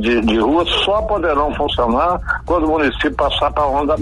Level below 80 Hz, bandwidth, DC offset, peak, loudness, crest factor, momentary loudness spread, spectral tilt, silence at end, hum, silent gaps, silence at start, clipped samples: -30 dBFS; 11.5 kHz; under 0.1%; -4 dBFS; -16 LUFS; 12 dB; 3 LU; -6 dB/octave; 0 s; none; none; 0 s; under 0.1%